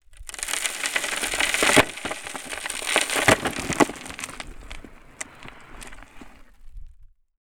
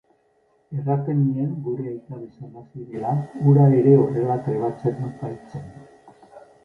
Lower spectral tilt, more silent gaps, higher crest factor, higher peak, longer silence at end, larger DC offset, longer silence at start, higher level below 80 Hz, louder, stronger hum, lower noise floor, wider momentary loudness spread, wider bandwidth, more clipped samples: second, -2 dB/octave vs -11.5 dB/octave; neither; first, 26 dB vs 18 dB; first, 0 dBFS vs -4 dBFS; first, 0.4 s vs 0.25 s; neither; second, 0.1 s vs 0.7 s; first, -46 dBFS vs -60 dBFS; about the same, -23 LUFS vs -21 LUFS; neither; second, -49 dBFS vs -63 dBFS; about the same, 23 LU vs 23 LU; first, over 20 kHz vs 2.7 kHz; neither